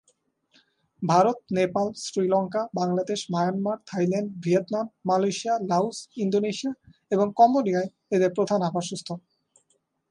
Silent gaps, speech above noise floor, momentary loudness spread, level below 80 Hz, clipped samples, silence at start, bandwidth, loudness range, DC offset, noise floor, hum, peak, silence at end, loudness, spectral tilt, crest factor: none; 46 dB; 9 LU; -70 dBFS; under 0.1%; 1 s; 11 kHz; 2 LU; under 0.1%; -71 dBFS; none; -6 dBFS; 0.9 s; -25 LUFS; -6 dB/octave; 20 dB